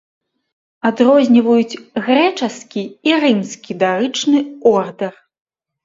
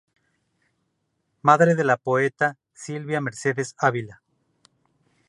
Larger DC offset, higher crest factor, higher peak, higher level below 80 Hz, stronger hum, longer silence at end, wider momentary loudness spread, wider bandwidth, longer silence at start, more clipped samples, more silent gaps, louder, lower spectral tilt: neither; second, 16 dB vs 22 dB; about the same, 0 dBFS vs -2 dBFS; first, -66 dBFS vs -72 dBFS; neither; second, 0.75 s vs 1.15 s; second, 13 LU vs 16 LU; second, 7.8 kHz vs 11.5 kHz; second, 0.85 s vs 1.45 s; neither; neither; first, -15 LUFS vs -22 LUFS; about the same, -5 dB/octave vs -6 dB/octave